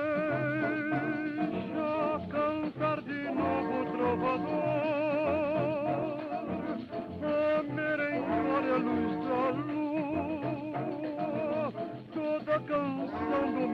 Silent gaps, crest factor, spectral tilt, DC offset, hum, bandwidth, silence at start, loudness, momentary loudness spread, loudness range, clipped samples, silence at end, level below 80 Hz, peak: none; 14 dB; -8.5 dB/octave; under 0.1%; none; 5.6 kHz; 0 s; -32 LUFS; 6 LU; 3 LU; under 0.1%; 0 s; -64 dBFS; -18 dBFS